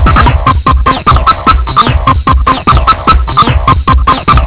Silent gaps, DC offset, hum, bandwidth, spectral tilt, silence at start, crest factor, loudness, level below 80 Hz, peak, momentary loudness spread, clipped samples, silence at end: none; under 0.1%; none; 4 kHz; -10 dB/octave; 0 s; 6 dB; -8 LUFS; -12 dBFS; 0 dBFS; 2 LU; 7%; 0 s